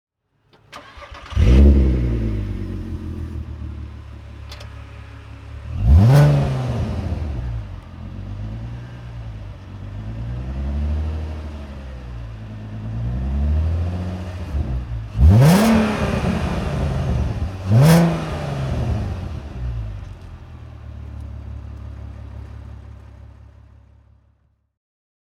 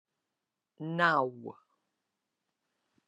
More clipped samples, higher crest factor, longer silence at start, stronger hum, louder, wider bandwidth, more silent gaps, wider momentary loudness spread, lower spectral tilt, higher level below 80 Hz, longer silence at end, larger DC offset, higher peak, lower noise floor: neither; second, 18 dB vs 24 dB; about the same, 0.7 s vs 0.8 s; neither; first, -20 LUFS vs -30 LUFS; first, 16 kHz vs 11.5 kHz; neither; first, 24 LU vs 20 LU; about the same, -7.5 dB/octave vs -6.5 dB/octave; first, -26 dBFS vs -86 dBFS; first, 1.85 s vs 1.55 s; neither; first, -2 dBFS vs -12 dBFS; second, -61 dBFS vs -88 dBFS